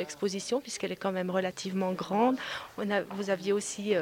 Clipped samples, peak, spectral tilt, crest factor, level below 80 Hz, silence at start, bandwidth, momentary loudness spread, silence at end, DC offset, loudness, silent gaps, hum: under 0.1%; -14 dBFS; -4.5 dB/octave; 16 dB; -70 dBFS; 0 s; 17 kHz; 6 LU; 0 s; under 0.1%; -31 LUFS; none; none